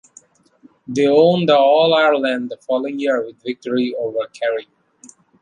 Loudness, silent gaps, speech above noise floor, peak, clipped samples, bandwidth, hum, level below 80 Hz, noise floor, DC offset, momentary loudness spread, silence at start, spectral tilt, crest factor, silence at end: -17 LUFS; none; 35 dB; -2 dBFS; under 0.1%; 10 kHz; none; -68 dBFS; -52 dBFS; under 0.1%; 12 LU; 0.9 s; -5.5 dB/octave; 16 dB; 0.8 s